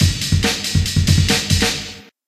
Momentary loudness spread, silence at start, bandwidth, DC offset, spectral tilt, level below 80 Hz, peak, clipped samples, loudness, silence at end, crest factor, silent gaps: 6 LU; 0 s; 15 kHz; under 0.1%; -4 dB/octave; -28 dBFS; 0 dBFS; under 0.1%; -16 LUFS; 0.25 s; 16 dB; none